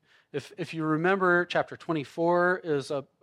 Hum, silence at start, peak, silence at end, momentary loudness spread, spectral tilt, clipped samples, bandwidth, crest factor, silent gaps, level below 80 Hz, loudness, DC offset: none; 0.35 s; -10 dBFS; 0.2 s; 13 LU; -6.5 dB/octave; under 0.1%; 11 kHz; 18 dB; none; -78 dBFS; -27 LUFS; under 0.1%